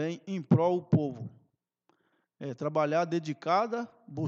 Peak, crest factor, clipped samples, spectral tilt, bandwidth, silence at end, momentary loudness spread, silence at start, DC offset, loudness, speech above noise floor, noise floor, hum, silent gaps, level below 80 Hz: -12 dBFS; 20 dB; under 0.1%; -8 dB/octave; 7.4 kHz; 0 s; 16 LU; 0 s; under 0.1%; -29 LUFS; 44 dB; -74 dBFS; none; none; -74 dBFS